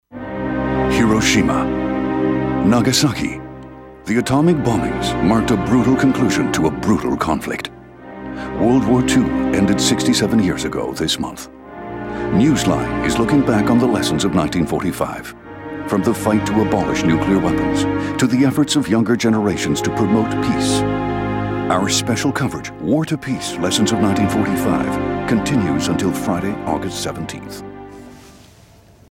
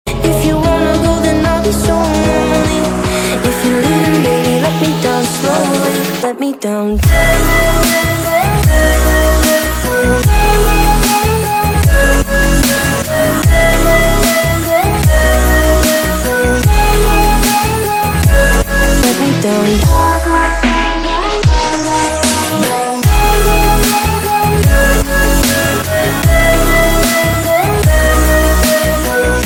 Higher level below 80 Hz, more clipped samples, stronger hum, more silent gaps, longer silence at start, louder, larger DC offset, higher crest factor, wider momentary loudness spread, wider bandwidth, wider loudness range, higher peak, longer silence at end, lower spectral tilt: second, -38 dBFS vs -16 dBFS; neither; neither; neither; about the same, 0.1 s vs 0.05 s; second, -17 LUFS vs -11 LUFS; neither; about the same, 14 dB vs 10 dB; first, 13 LU vs 4 LU; second, 17 kHz vs over 20 kHz; about the same, 2 LU vs 2 LU; second, -4 dBFS vs 0 dBFS; first, 0.8 s vs 0 s; about the same, -5 dB/octave vs -4.5 dB/octave